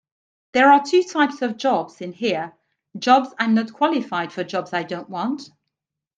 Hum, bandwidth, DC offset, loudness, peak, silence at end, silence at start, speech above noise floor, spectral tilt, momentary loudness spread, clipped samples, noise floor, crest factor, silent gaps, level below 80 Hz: none; 9.2 kHz; under 0.1%; -20 LUFS; -2 dBFS; 0.75 s; 0.55 s; 62 dB; -4.5 dB/octave; 12 LU; under 0.1%; -82 dBFS; 20 dB; none; -72 dBFS